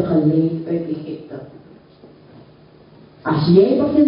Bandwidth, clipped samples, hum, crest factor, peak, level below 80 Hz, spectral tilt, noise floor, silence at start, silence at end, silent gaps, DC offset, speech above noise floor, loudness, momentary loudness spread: 5.4 kHz; under 0.1%; none; 18 dB; -2 dBFS; -50 dBFS; -13 dB/octave; -46 dBFS; 0 s; 0 s; none; under 0.1%; 30 dB; -17 LUFS; 19 LU